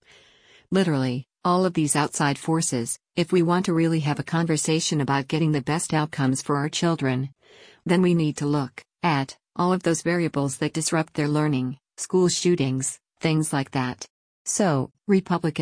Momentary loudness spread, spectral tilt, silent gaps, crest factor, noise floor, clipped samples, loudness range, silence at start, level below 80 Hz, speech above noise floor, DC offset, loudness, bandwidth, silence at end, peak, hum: 7 LU; -5 dB/octave; 14.10-14.45 s; 14 dB; -56 dBFS; under 0.1%; 2 LU; 0.7 s; -62 dBFS; 33 dB; under 0.1%; -24 LUFS; 10.5 kHz; 0 s; -8 dBFS; none